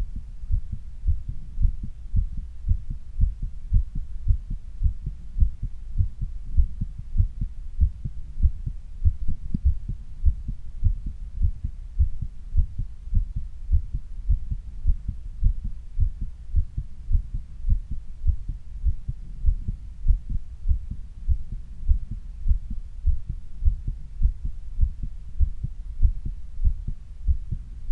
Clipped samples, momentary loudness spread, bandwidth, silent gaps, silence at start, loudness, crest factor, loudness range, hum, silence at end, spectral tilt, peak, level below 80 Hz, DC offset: under 0.1%; 10 LU; 0.6 kHz; none; 0 s; -31 LUFS; 20 dB; 2 LU; none; 0 s; -9.5 dB/octave; -4 dBFS; -26 dBFS; under 0.1%